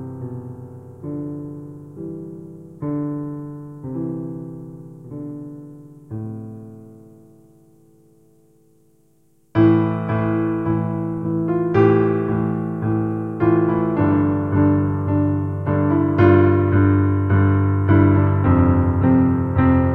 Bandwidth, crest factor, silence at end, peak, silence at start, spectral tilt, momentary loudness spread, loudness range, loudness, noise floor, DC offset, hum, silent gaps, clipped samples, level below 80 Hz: 3.9 kHz; 18 dB; 0 s; -2 dBFS; 0 s; -11 dB/octave; 20 LU; 19 LU; -18 LUFS; -60 dBFS; under 0.1%; none; none; under 0.1%; -42 dBFS